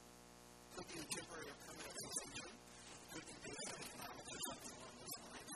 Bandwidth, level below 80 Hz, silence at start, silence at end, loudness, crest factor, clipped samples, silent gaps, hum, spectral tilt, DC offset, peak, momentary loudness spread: 14 kHz; -74 dBFS; 0 s; 0 s; -50 LUFS; 24 dB; under 0.1%; none; 60 Hz at -70 dBFS; -2 dB/octave; under 0.1%; -30 dBFS; 11 LU